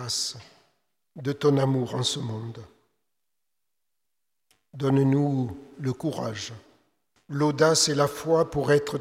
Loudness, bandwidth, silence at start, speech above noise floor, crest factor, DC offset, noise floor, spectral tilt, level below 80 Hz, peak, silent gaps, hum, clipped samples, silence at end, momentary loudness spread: -25 LUFS; 15.5 kHz; 0 s; 60 dB; 20 dB; under 0.1%; -85 dBFS; -5 dB/octave; -60 dBFS; -8 dBFS; none; none; under 0.1%; 0 s; 15 LU